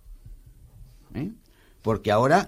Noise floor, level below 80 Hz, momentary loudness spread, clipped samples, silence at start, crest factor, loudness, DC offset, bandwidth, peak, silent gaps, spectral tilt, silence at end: -55 dBFS; -48 dBFS; 16 LU; under 0.1%; 0.1 s; 22 dB; -26 LUFS; under 0.1%; 15.5 kHz; -6 dBFS; none; -6 dB/octave; 0 s